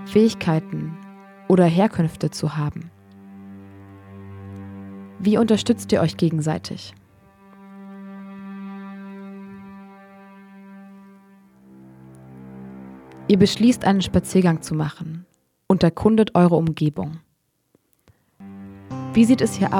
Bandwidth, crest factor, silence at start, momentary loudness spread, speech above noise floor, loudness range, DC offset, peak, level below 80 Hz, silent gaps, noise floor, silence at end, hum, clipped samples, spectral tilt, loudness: 15 kHz; 20 dB; 0 s; 24 LU; 48 dB; 19 LU; under 0.1%; -2 dBFS; -52 dBFS; none; -67 dBFS; 0 s; none; under 0.1%; -6.5 dB/octave; -20 LUFS